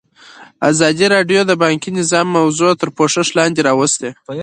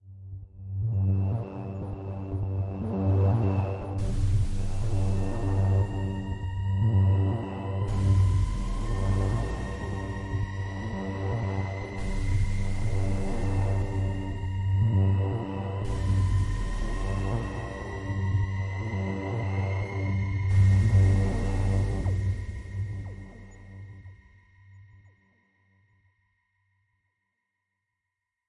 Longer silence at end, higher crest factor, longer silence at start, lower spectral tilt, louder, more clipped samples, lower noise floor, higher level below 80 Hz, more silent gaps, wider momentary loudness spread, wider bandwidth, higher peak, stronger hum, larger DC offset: second, 0 s vs 3.65 s; about the same, 14 dB vs 16 dB; first, 0.4 s vs 0.05 s; second, -4 dB/octave vs -8 dB/octave; first, -14 LUFS vs -29 LUFS; neither; second, -41 dBFS vs -85 dBFS; second, -58 dBFS vs -36 dBFS; neither; second, 4 LU vs 12 LU; about the same, 10 kHz vs 10.5 kHz; first, 0 dBFS vs -12 dBFS; neither; neither